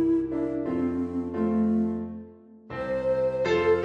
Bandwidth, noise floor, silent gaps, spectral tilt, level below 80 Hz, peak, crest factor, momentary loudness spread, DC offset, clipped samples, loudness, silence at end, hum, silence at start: 7.8 kHz; -47 dBFS; none; -8 dB/octave; -54 dBFS; -12 dBFS; 14 dB; 11 LU; under 0.1%; under 0.1%; -27 LUFS; 0 s; none; 0 s